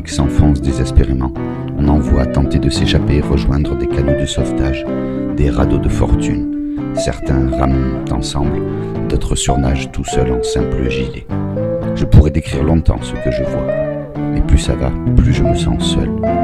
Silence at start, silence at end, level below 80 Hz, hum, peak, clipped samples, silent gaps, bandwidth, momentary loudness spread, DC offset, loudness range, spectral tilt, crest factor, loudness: 0 s; 0 s; -20 dBFS; none; 0 dBFS; 0.4%; none; 11.5 kHz; 7 LU; under 0.1%; 2 LU; -6.5 dB/octave; 14 dB; -16 LUFS